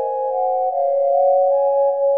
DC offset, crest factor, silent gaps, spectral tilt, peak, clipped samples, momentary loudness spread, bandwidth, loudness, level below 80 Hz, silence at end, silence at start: 0.3%; 10 dB; none; -2 dB/octave; -8 dBFS; under 0.1%; 5 LU; 2.2 kHz; -18 LUFS; -78 dBFS; 0 s; 0 s